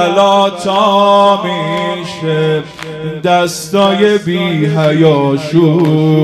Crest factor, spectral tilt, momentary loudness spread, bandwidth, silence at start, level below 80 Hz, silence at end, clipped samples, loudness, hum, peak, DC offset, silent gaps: 10 dB; -6 dB/octave; 9 LU; 14 kHz; 0 s; -52 dBFS; 0 s; 0.2%; -11 LUFS; none; 0 dBFS; under 0.1%; none